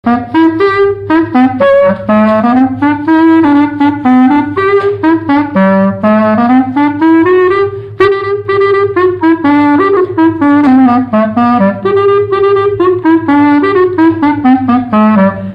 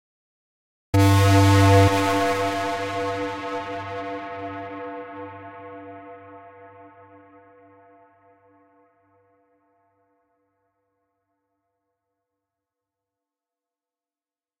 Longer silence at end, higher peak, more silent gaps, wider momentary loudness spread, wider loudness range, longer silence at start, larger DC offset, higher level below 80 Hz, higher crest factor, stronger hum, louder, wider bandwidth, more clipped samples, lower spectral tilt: second, 0 s vs 7.75 s; first, 0 dBFS vs -4 dBFS; neither; second, 4 LU vs 24 LU; second, 1 LU vs 24 LU; second, 0.05 s vs 0.95 s; neither; first, -44 dBFS vs -54 dBFS; second, 8 dB vs 22 dB; neither; first, -8 LUFS vs -21 LUFS; second, 5.4 kHz vs 16 kHz; neither; first, -9 dB/octave vs -6 dB/octave